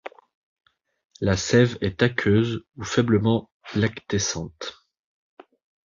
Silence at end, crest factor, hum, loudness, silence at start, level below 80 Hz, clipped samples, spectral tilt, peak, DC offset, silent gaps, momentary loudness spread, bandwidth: 1.15 s; 22 dB; none; -23 LUFS; 0.05 s; -48 dBFS; under 0.1%; -5.5 dB/octave; -4 dBFS; under 0.1%; 0.35-0.56 s, 1.05-1.10 s, 3.52-3.60 s; 13 LU; 7.6 kHz